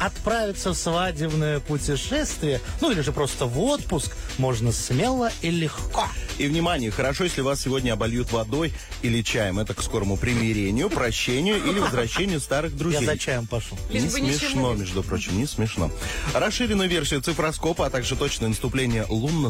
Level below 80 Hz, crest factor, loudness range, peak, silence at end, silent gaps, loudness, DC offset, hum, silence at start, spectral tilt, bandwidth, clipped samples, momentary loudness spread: -36 dBFS; 12 dB; 1 LU; -12 dBFS; 0 s; none; -24 LUFS; under 0.1%; none; 0 s; -4.5 dB/octave; 16 kHz; under 0.1%; 4 LU